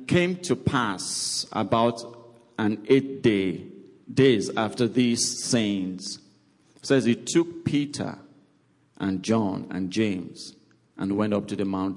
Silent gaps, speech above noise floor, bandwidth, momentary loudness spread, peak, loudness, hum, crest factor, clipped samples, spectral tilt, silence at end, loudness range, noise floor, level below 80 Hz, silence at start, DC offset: none; 39 dB; 11.5 kHz; 15 LU; -8 dBFS; -25 LUFS; none; 18 dB; under 0.1%; -4.5 dB/octave; 0 s; 5 LU; -63 dBFS; -62 dBFS; 0 s; under 0.1%